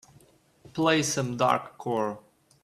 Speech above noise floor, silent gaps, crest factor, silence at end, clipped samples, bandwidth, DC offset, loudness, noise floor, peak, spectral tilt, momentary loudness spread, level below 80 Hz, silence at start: 33 dB; none; 22 dB; 0.45 s; under 0.1%; 14 kHz; under 0.1%; -27 LUFS; -59 dBFS; -6 dBFS; -4 dB/octave; 12 LU; -66 dBFS; 0.75 s